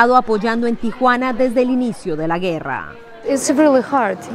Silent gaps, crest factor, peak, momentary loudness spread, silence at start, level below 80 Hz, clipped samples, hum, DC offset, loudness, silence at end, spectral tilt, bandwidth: none; 16 dB; 0 dBFS; 10 LU; 0 s; -48 dBFS; under 0.1%; none; under 0.1%; -17 LUFS; 0 s; -5 dB/octave; 15 kHz